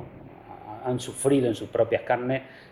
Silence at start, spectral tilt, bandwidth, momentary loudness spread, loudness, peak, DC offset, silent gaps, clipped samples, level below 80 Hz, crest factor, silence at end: 0 s; -5.5 dB/octave; 14.5 kHz; 21 LU; -26 LUFS; -10 dBFS; under 0.1%; none; under 0.1%; -60 dBFS; 18 dB; 0.05 s